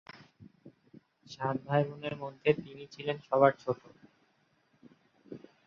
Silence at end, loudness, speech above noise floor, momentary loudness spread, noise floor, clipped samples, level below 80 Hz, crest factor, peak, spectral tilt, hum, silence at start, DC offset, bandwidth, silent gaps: 0.3 s; -32 LUFS; 40 dB; 24 LU; -72 dBFS; under 0.1%; -72 dBFS; 26 dB; -8 dBFS; -7.5 dB/octave; none; 0.15 s; under 0.1%; 7 kHz; none